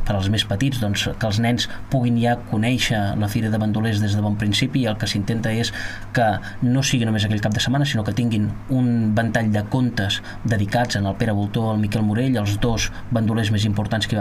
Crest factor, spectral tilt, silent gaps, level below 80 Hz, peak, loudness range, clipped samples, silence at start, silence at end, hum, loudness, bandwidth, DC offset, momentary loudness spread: 16 dB; -5.5 dB/octave; none; -38 dBFS; -4 dBFS; 1 LU; under 0.1%; 0 s; 0 s; none; -21 LUFS; 15.5 kHz; under 0.1%; 3 LU